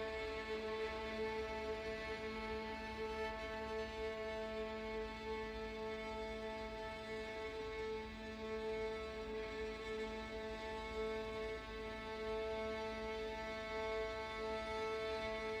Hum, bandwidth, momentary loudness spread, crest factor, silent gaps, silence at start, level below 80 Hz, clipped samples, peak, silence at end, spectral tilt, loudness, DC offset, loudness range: none; 19.5 kHz; 4 LU; 12 dB; none; 0 s; -58 dBFS; under 0.1%; -32 dBFS; 0 s; -5 dB/octave; -44 LUFS; under 0.1%; 2 LU